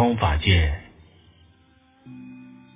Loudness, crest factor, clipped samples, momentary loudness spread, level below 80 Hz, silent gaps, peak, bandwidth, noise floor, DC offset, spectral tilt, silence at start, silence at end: -21 LUFS; 20 dB; under 0.1%; 25 LU; -30 dBFS; none; -6 dBFS; 3.9 kHz; -58 dBFS; under 0.1%; -10 dB/octave; 0 s; 0.3 s